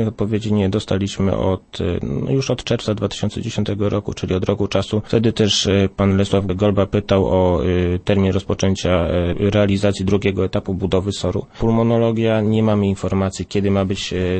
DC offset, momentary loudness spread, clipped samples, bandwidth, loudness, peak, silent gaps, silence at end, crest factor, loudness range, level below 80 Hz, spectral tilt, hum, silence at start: under 0.1%; 6 LU; under 0.1%; 8.8 kHz; -19 LUFS; -2 dBFS; none; 0 s; 16 dB; 4 LU; -38 dBFS; -6.5 dB/octave; none; 0 s